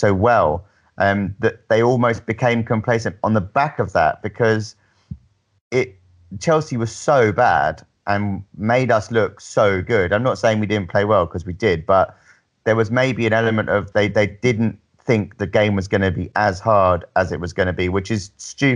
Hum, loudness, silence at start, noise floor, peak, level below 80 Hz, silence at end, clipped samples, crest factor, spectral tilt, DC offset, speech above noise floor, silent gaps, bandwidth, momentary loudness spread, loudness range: none; -19 LUFS; 0 s; -42 dBFS; -4 dBFS; -50 dBFS; 0 s; under 0.1%; 16 dB; -6.5 dB/octave; under 0.1%; 24 dB; 5.61-5.71 s; 10 kHz; 9 LU; 3 LU